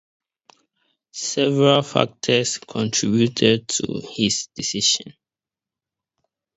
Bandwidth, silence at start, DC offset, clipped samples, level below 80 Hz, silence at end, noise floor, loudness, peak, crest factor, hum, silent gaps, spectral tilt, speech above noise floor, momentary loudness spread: 8.2 kHz; 1.15 s; under 0.1%; under 0.1%; -60 dBFS; 1.45 s; -90 dBFS; -20 LUFS; 0 dBFS; 22 dB; none; none; -3.5 dB/octave; 69 dB; 9 LU